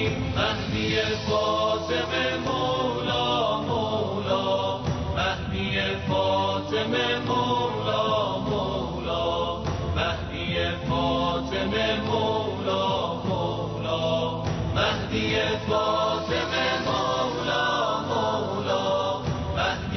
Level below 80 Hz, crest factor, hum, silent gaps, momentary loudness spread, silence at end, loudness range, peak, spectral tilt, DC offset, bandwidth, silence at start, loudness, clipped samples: -44 dBFS; 16 dB; none; none; 4 LU; 0 s; 1 LU; -10 dBFS; -5.5 dB/octave; under 0.1%; 6.4 kHz; 0 s; -25 LUFS; under 0.1%